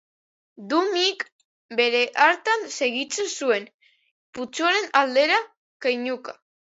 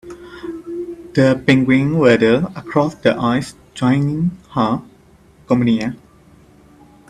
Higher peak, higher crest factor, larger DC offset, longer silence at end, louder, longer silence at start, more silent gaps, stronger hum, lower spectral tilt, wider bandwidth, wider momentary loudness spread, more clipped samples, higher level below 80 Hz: second, -4 dBFS vs 0 dBFS; about the same, 22 dB vs 18 dB; neither; second, 0.45 s vs 1.15 s; second, -22 LUFS vs -16 LUFS; first, 0.6 s vs 0.05 s; first, 1.32-1.39 s, 1.45-1.69 s, 3.74-3.79 s, 4.11-4.33 s, 5.57-5.80 s vs none; neither; second, -1 dB/octave vs -7 dB/octave; second, 8 kHz vs 11 kHz; about the same, 15 LU vs 16 LU; neither; second, -78 dBFS vs -48 dBFS